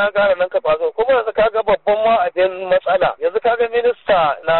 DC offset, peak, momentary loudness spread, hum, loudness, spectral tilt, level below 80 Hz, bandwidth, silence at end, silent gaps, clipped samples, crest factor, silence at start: under 0.1%; -6 dBFS; 3 LU; none; -16 LUFS; -1.5 dB/octave; -48 dBFS; 4.3 kHz; 0 s; none; under 0.1%; 10 dB; 0 s